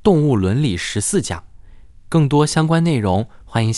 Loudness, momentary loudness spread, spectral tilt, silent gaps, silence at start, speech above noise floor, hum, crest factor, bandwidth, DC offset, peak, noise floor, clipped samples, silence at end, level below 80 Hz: -17 LUFS; 7 LU; -6 dB/octave; none; 0.05 s; 24 dB; none; 16 dB; 12 kHz; under 0.1%; 0 dBFS; -40 dBFS; under 0.1%; 0 s; -42 dBFS